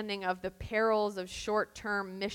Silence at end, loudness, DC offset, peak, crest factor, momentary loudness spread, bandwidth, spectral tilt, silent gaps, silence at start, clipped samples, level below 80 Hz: 0 s; -33 LUFS; under 0.1%; -18 dBFS; 16 dB; 7 LU; 17 kHz; -4.5 dB/octave; none; 0 s; under 0.1%; -56 dBFS